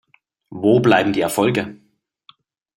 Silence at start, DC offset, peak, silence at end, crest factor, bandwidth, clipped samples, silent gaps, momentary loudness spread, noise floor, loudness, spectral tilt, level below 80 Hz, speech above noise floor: 0.5 s; under 0.1%; 0 dBFS; 1.05 s; 20 dB; 16 kHz; under 0.1%; none; 15 LU; -53 dBFS; -17 LUFS; -5.5 dB/octave; -56 dBFS; 37 dB